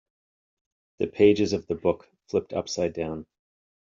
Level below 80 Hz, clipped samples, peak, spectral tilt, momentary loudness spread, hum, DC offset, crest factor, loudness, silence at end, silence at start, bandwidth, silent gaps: -60 dBFS; under 0.1%; -6 dBFS; -5.5 dB/octave; 13 LU; none; under 0.1%; 20 dB; -26 LUFS; 0.75 s; 1 s; 7.4 kHz; none